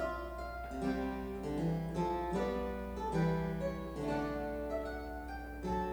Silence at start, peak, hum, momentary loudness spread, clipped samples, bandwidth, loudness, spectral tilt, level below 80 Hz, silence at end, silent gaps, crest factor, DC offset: 0 s; -22 dBFS; none; 8 LU; under 0.1%; over 20 kHz; -38 LUFS; -7.5 dB/octave; -48 dBFS; 0 s; none; 14 dB; under 0.1%